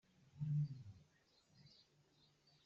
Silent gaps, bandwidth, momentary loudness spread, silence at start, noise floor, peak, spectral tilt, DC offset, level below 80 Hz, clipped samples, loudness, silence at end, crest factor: none; 6.8 kHz; 25 LU; 0.35 s; -76 dBFS; -34 dBFS; -9.5 dB/octave; under 0.1%; -82 dBFS; under 0.1%; -45 LUFS; 0.95 s; 16 dB